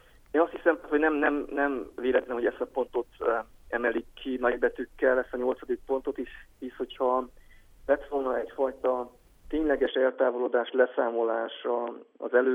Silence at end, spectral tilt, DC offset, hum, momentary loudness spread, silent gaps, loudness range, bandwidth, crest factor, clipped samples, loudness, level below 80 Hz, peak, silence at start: 0 s; -6 dB/octave; under 0.1%; none; 10 LU; none; 3 LU; 3.8 kHz; 18 dB; under 0.1%; -29 LUFS; -54 dBFS; -10 dBFS; 0.35 s